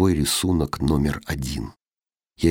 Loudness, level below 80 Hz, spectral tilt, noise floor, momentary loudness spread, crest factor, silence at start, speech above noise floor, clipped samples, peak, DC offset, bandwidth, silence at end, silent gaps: -23 LUFS; -36 dBFS; -5 dB/octave; under -90 dBFS; 10 LU; 18 dB; 0 s; over 68 dB; under 0.1%; -4 dBFS; under 0.1%; 18.5 kHz; 0 s; none